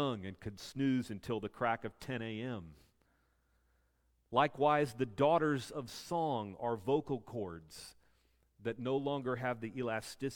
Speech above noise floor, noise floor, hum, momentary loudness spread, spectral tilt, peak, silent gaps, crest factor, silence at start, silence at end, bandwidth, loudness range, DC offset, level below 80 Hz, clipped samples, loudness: 39 dB; -76 dBFS; none; 14 LU; -6 dB/octave; -16 dBFS; none; 22 dB; 0 s; 0 s; 17.5 kHz; 6 LU; under 0.1%; -68 dBFS; under 0.1%; -37 LUFS